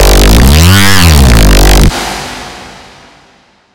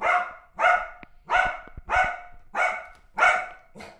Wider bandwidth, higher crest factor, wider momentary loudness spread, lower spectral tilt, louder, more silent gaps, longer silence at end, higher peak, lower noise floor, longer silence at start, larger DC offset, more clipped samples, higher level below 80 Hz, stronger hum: first, over 20 kHz vs 11 kHz; second, 6 dB vs 18 dB; about the same, 18 LU vs 18 LU; first, -4.5 dB/octave vs -2.5 dB/octave; first, -5 LUFS vs -24 LUFS; neither; first, 0.95 s vs 0.1 s; first, 0 dBFS vs -8 dBFS; about the same, -44 dBFS vs -45 dBFS; about the same, 0 s vs 0 s; neither; first, 10% vs under 0.1%; first, -8 dBFS vs -48 dBFS; neither